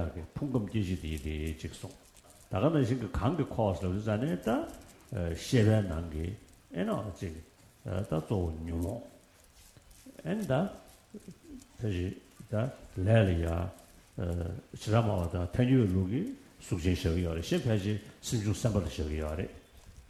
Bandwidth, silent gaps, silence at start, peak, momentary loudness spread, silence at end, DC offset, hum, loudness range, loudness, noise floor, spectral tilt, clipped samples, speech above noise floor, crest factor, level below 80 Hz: 14 kHz; none; 0 s; -12 dBFS; 16 LU; 0.1 s; under 0.1%; none; 7 LU; -32 LUFS; -59 dBFS; -7 dB/octave; under 0.1%; 28 dB; 20 dB; -46 dBFS